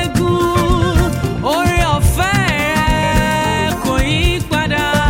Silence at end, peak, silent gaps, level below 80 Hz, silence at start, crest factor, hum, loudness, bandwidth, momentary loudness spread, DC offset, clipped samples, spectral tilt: 0 s; -2 dBFS; none; -22 dBFS; 0 s; 12 dB; none; -15 LUFS; 17 kHz; 3 LU; under 0.1%; under 0.1%; -5 dB/octave